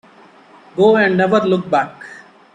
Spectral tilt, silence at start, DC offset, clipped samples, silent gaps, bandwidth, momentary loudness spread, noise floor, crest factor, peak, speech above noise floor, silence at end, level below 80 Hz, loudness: -7 dB/octave; 0.75 s; under 0.1%; under 0.1%; none; 9.4 kHz; 20 LU; -45 dBFS; 16 dB; -2 dBFS; 32 dB; 0.35 s; -60 dBFS; -14 LUFS